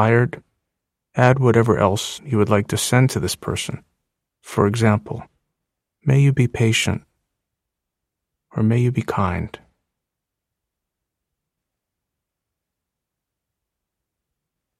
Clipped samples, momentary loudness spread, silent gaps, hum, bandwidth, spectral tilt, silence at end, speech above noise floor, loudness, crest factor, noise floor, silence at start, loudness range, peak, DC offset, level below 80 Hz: under 0.1%; 14 LU; none; none; 14.5 kHz; -6 dB/octave; 5.3 s; 65 dB; -19 LUFS; 22 dB; -83 dBFS; 0 s; 6 LU; 0 dBFS; under 0.1%; -50 dBFS